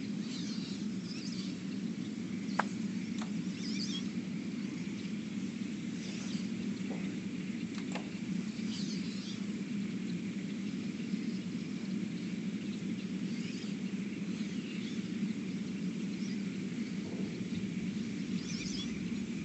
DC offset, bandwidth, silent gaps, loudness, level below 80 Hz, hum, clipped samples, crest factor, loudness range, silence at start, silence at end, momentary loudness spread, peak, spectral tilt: under 0.1%; 8.4 kHz; none; -38 LUFS; -70 dBFS; none; under 0.1%; 24 dB; 1 LU; 0 s; 0 s; 2 LU; -14 dBFS; -5.5 dB/octave